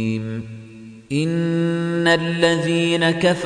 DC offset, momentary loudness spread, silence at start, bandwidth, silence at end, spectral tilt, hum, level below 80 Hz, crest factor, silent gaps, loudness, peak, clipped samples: under 0.1%; 15 LU; 0 s; 10 kHz; 0 s; -5.5 dB/octave; none; -56 dBFS; 16 dB; none; -19 LUFS; -4 dBFS; under 0.1%